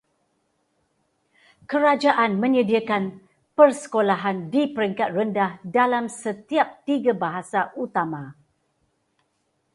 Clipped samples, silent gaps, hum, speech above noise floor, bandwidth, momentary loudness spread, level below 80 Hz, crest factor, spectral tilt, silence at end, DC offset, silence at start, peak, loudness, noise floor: under 0.1%; none; none; 50 dB; 11.5 kHz; 10 LU; -70 dBFS; 20 dB; -5.5 dB/octave; 1.45 s; under 0.1%; 1.7 s; -2 dBFS; -22 LUFS; -71 dBFS